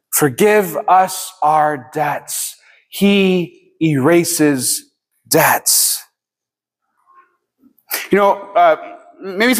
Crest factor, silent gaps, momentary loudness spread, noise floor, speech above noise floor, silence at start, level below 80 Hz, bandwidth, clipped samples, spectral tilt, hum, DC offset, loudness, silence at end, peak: 16 dB; none; 11 LU; -86 dBFS; 72 dB; 0.1 s; -62 dBFS; 16 kHz; under 0.1%; -3.5 dB/octave; none; under 0.1%; -15 LUFS; 0 s; 0 dBFS